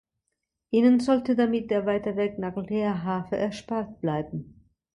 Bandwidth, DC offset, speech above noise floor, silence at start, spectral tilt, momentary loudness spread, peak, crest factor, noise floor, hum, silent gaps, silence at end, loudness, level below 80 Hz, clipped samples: 10.5 kHz; under 0.1%; 57 dB; 0.7 s; -7.5 dB/octave; 11 LU; -10 dBFS; 16 dB; -82 dBFS; none; none; 0.5 s; -26 LUFS; -60 dBFS; under 0.1%